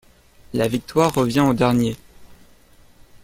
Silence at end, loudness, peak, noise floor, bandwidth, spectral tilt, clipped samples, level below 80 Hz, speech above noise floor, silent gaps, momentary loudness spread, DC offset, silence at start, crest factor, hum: 0.05 s; -20 LUFS; -4 dBFS; -50 dBFS; 16.5 kHz; -6 dB/octave; under 0.1%; -50 dBFS; 32 dB; none; 9 LU; under 0.1%; 0.5 s; 18 dB; 60 Hz at -40 dBFS